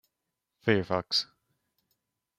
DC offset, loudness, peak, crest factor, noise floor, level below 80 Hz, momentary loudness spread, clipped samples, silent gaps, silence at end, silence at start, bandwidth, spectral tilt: under 0.1%; -29 LUFS; -10 dBFS; 24 dB; -85 dBFS; -68 dBFS; 7 LU; under 0.1%; none; 1.15 s; 0.65 s; 14.5 kHz; -5 dB/octave